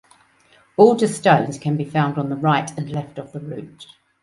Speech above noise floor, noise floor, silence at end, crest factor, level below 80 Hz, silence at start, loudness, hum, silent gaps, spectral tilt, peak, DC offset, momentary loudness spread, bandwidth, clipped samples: 36 dB; -56 dBFS; 0.4 s; 20 dB; -60 dBFS; 0.8 s; -19 LUFS; none; none; -6.5 dB/octave; 0 dBFS; under 0.1%; 18 LU; 11.5 kHz; under 0.1%